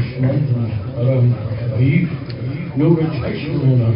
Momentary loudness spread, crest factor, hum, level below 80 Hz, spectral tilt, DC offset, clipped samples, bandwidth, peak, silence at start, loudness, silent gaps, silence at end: 8 LU; 14 dB; none; -40 dBFS; -13.5 dB/octave; under 0.1%; under 0.1%; 5.4 kHz; -2 dBFS; 0 s; -18 LUFS; none; 0 s